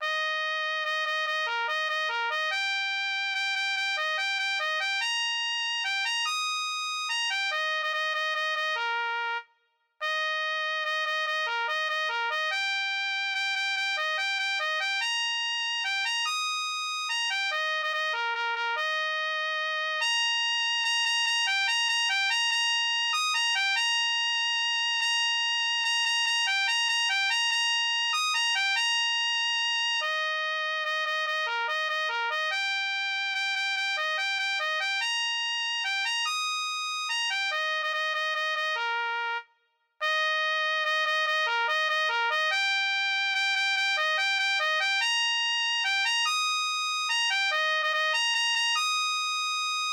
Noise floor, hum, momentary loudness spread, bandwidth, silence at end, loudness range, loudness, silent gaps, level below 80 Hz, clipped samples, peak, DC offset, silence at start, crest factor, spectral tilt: -71 dBFS; none; 4 LU; 18 kHz; 0 s; 4 LU; -26 LUFS; none; under -90 dBFS; under 0.1%; -16 dBFS; under 0.1%; 0 s; 12 dB; 6 dB/octave